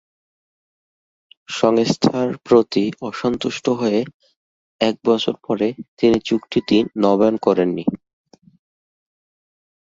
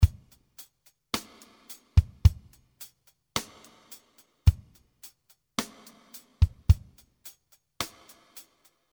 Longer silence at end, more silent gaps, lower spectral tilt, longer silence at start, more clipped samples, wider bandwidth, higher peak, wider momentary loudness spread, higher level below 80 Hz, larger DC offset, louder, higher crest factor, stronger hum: first, 1.85 s vs 1.1 s; first, 4.14-4.20 s, 4.36-4.79 s, 5.88-5.97 s vs none; about the same, -6 dB/octave vs -5 dB/octave; first, 1.5 s vs 0 s; neither; second, 8 kHz vs over 20 kHz; first, -2 dBFS vs -6 dBFS; second, 8 LU vs 24 LU; second, -56 dBFS vs -34 dBFS; neither; first, -19 LUFS vs -28 LUFS; second, 18 dB vs 24 dB; neither